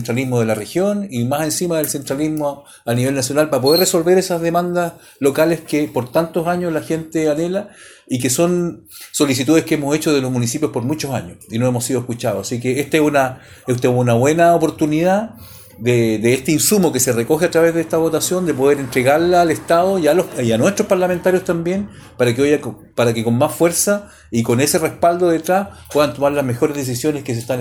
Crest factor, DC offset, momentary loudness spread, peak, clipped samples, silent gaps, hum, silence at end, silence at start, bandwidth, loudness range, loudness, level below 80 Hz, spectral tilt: 14 dB; under 0.1%; 8 LU; -2 dBFS; under 0.1%; none; none; 0 s; 0 s; over 20 kHz; 4 LU; -17 LUFS; -50 dBFS; -5 dB/octave